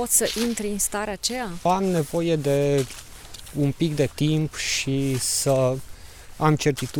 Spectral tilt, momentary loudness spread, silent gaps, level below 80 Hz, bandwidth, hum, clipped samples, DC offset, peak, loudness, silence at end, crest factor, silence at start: -4.5 dB/octave; 6 LU; none; -46 dBFS; 18.5 kHz; none; under 0.1%; under 0.1%; -6 dBFS; -23 LUFS; 0 s; 18 dB; 0 s